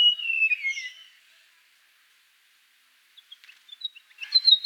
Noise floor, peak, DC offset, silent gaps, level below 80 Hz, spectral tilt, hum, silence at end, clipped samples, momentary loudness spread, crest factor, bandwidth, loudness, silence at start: -62 dBFS; -6 dBFS; under 0.1%; none; under -90 dBFS; 8 dB/octave; 50 Hz at -110 dBFS; 0 s; under 0.1%; 20 LU; 22 dB; 19 kHz; -23 LUFS; 0 s